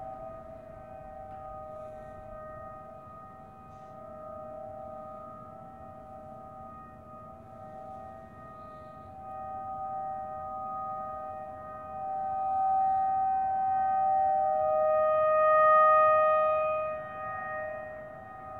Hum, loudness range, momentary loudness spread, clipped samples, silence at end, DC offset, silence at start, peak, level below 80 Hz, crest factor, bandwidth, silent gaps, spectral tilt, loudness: none; 21 LU; 23 LU; under 0.1%; 0 s; under 0.1%; 0 s; -14 dBFS; -62 dBFS; 16 dB; 3.9 kHz; none; -7.5 dB/octave; -28 LUFS